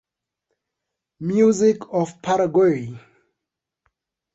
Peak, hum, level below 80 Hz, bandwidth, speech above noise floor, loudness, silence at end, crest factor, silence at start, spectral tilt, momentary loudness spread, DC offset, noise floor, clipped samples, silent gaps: -6 dBFS; none; -64 dBFS; 8.2 kHz; 65 dB; -19 LUFS; 1.35 s; 16 dB; 1.2 s; -6.5 dB/octave; 12 LU; under 0.1%; -84 dBFS; under 0.1%; none